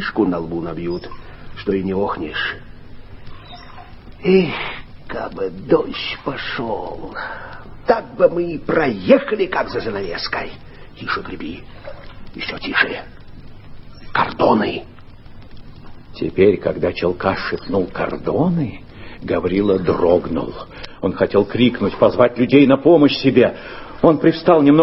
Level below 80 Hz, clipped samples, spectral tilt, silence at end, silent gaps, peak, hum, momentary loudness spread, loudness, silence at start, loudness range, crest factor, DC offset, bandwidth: -42 dBFS; under 0.1%; -9.5 dB/octave; 0 s; none; 0 dBFS; none; 20 LU; -18 LUFS; 0 s; 10 LU; 18 dB; under 0.1%; 5.8 kHz